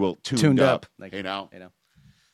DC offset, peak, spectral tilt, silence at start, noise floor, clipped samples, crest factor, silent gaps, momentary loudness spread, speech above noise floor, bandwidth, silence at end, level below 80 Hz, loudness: under 0.1%; -6 dBFS; -6 dB/octave; 0 s; -58 dBFS; under 0.1%; 20 dB; none; 18 LU; 35 dB; 14 kHz; 0.65 s; -62 dBFS; -23 LUFS